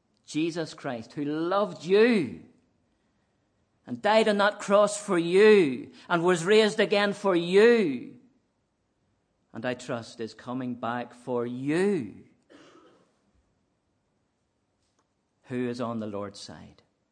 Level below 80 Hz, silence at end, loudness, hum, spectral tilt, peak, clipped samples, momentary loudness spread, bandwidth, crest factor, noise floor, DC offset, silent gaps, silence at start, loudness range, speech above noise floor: -76 dBFS; 0.45 s; -25 LUFS; none; -5 dB/octave; -8 dBFS; under 0.1%; 17 LU; 10 kHz; 20 dB; -75 dBFS; under 0.1%; none; 0.3 s; 15 LU; 50 dB